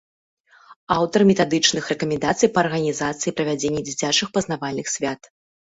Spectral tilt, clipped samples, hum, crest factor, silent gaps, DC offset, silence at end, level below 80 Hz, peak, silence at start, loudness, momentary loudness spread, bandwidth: -3.5 dB/octave; under 0.1%; none; 20 dB; 0.76-0.87 s; under 0.1%; 0.6 s; -56 dBFS; -2 dBFS; 0.7 s; -21 LUFS; 9 LU; 8.2 kHz